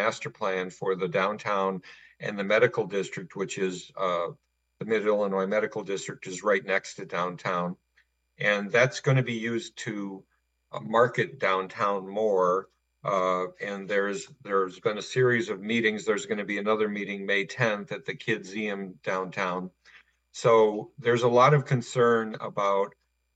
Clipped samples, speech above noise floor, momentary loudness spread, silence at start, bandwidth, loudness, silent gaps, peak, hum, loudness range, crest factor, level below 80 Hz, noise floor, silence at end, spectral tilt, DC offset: under 0.1%; 42 dB; 12 LU; 0 s; 9.2 kHz; -27 LUFS; none; -8 dBFS; none; 5 LU; 20 dB; -74 dBFS; -69 dBFS; 0.45 s; -5.5 dB/octave; under 0.1%